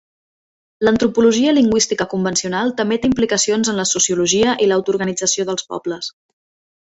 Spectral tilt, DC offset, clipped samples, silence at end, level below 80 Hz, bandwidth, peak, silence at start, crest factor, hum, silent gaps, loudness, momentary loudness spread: -3 dB/octave; under 0.1%; under 0.1%; 0.75 s; -50 dBFS; 8.2 kHz; -2 dBFS; 0.8 s; 14 dB; none; none; -16 LUFS; 9 LU